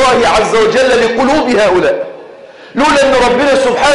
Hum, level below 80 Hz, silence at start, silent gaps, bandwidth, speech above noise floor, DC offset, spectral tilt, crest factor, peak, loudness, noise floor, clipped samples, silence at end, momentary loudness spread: none; -36 dBFS; 0 s; none; 11.5 kHz; 24 dB; under 0.1%; -3.5 dB/octave; 8 dB; -2 dBFS; -10 LUFS; -33 dBFS; under 0.1%; 0 s; 6 LU